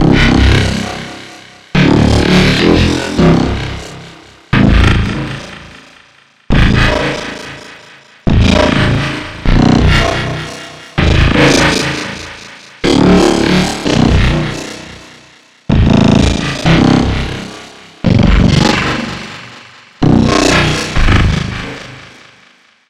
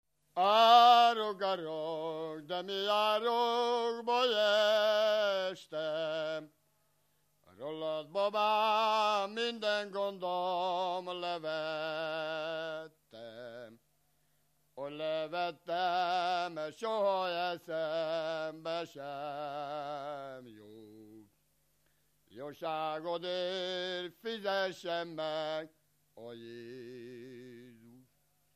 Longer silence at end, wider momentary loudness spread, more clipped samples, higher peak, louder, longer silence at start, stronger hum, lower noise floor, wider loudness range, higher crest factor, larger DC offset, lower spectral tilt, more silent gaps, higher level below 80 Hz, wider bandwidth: first, 0.85 s vs 0.6 s; about the same, 19 LU vs 19 LU; neither; first, 0 dBFS vs -10 dBFS; first, -11 LUFS vs -33 LUFS; second, 0 s vs 0.35 s; neither; second, -47 dBFS vs -76 dBFS; second, 3 LU vs 12 LU; second, 12 dB vs 24 dB; neither; first, -5.5 dB/octave vs -3.5 dB/octave; neither; first, -20 dBFS vs -86 dBFS; second, 13.5 kHz vs 15 kHz